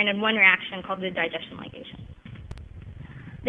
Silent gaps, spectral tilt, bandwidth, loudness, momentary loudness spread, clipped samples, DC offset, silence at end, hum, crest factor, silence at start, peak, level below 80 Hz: none; -6.5 dB/octave; 10 kHz; -22 LUFS; 26 LU; under 0.1%; under 0.1%; 0 s; none; 24 dB; 0 s; -4 dBFS; -50 dBFS